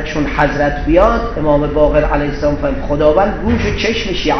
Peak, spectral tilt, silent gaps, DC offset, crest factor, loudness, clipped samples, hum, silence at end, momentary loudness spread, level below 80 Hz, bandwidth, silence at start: 0 dBFS; -6.5 dB/octave; none; under 0.1%; 14 dB; -14 LUFS; under 0.1%; none; 0 s; 5 LU; -22 dBFS; 6.4 kHz; 0 s